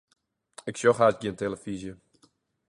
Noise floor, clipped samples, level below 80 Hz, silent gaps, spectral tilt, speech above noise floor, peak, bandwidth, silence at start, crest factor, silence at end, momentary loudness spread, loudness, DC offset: -66 dBFS; under 0.1%; -62 dBFS; none; -5 dB/octave; 40 dB; -8 dBFS; 11.5 kHz; 0.65 s; 22 dB; 0.75 s; 17 LU; -27 LUFS; under 0.1%